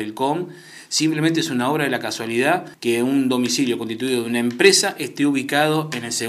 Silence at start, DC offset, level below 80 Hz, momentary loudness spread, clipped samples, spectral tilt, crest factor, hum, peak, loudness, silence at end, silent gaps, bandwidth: 0 s; under 0.1%; -70 dBFS; 8 LU; under 0.1%; -3.5 dB/octave; 20 dB; none; 0 dBFS; -20 LUFS; 0 s; none; 16 kHz